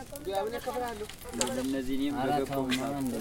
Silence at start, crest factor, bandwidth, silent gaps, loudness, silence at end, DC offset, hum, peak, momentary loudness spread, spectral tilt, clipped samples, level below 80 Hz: 0 s; 26 dB; 17 kHz; none; -32 LUFS; 0 s; under 0.1%; none; -6 dBFS; 6 LU; -4 dB/octave; under 0.1%; -52 dBFS